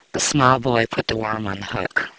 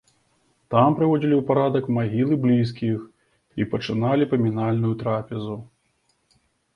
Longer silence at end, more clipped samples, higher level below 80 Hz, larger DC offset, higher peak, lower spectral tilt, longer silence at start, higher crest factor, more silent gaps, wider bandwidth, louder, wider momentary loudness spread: second, 0.1 s vs 1.1 s; neither; first, -46 dBFS vs -58 dBFS; neither; first, 0 dBFS vs -4 dBFS; second, -4 dB/octave vs -9 dB/octave; second, 0.15 s vs 0.7 s; about the same, 20 dB vs 18 dB; neither; first, 8 kHz vs 6.6 kHz; about the same, -20 LUFS vs -22 LUFS; about the same, 10 LU vs 12 LU